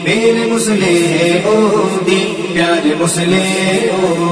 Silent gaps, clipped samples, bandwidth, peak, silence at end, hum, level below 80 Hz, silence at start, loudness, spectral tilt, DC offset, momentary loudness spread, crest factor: none; under 0.1%; 11 kHz; 0 dBFS; 0 s; none; -52 dBFS; 0 s; -12 LUFS; -4.5 dB/octave; 0.2%; 2 LU; 12 dB